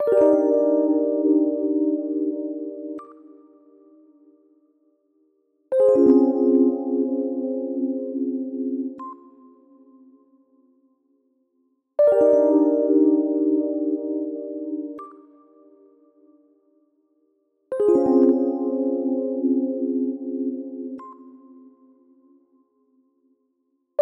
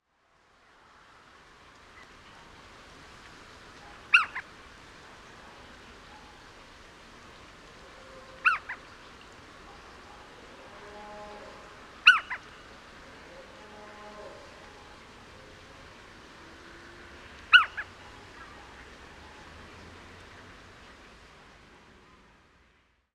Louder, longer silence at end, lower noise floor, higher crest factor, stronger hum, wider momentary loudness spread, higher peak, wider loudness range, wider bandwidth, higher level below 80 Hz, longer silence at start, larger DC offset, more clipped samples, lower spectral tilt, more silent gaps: first, -21 LUFS vs -24 LUFS; second, 0 s vs 2.25 s; first, -71 dBFS vs -67 dBFS; second, 18 dB vs 30 dB; neither; second, 16 LU vs 27 LU; about the same, -4 dBFS vs -4 dBFS; second, 16 LU vs 21 LU; second, 2.6 kHz vs 12.5 kHz; second, -72 dBFS vs -62 dBFS; second, 0 s vs 1.95 s; neither; neither; first, -9 dB/octave vs -1.5 dB/octave; neither